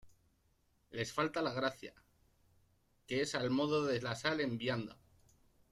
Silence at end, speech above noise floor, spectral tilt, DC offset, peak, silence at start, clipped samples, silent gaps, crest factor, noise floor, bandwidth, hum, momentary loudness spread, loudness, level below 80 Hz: 0.75 s; 38 dB; -5 dB/octave; under 0.1%; -20 dBFS; 0.05 s; under 0.1%; none; 20 dB; -75 dBFS; 14 kHz; none; 13 LU; -37 LUFS; -72 dBFS